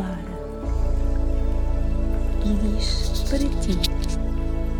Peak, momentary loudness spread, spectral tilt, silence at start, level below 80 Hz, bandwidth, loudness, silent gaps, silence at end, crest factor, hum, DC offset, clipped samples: -6 dBFS; 5 LU; -6 dB/octave; 0 s; -22 dBFS; 15 kHz; -26 LUFS; none; 0 s; 14 dB; none; 0.3%; under 0.1%